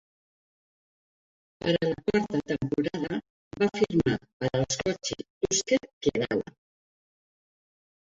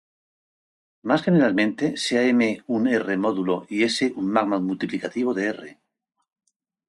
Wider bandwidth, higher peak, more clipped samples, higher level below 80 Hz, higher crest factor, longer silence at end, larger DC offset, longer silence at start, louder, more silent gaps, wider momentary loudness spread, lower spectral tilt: second, 8 kHz vs 11 kHz; second, -10 dBFS vs -6 dBFS; neither; first, -56 dBFS vs -68 dBFS; about the same, 20 dB vs 18 dB; first, 1.6 s vs 1.15 s; neither; first, 1.65 s vs 1.05 s; second, -28 LUFS vs -22 LUFS; first, 3.30-3.51 s, 4.33-4.40 s, 5.30-5.41 s, 5.93-6.01 s vs none; about the same, 8 LU vs 8 LU; about the same, -4.5 dB/octave vs -5.5 dB/octave